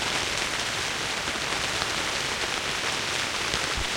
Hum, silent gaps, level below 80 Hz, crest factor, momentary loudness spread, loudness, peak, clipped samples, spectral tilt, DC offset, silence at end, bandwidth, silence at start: none; none; -46 dBFS; 22 dB; 1 LU; -26 LUFS; -6 dBFS; under 0.1%; -1.5 dB/octave; under 0.1%; 0 s; 16.5 kHz; 0 s